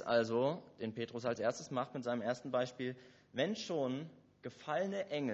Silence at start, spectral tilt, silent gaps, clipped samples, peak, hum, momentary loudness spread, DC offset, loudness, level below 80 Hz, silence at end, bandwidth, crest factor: 0 s; -4.5 dB/octave; none; under 0.1%; -20 dBFS; none; 11 LU; under 0.1%; -39 LUFS; -80 dBFS; 0 s; 8 kHz; 18 dB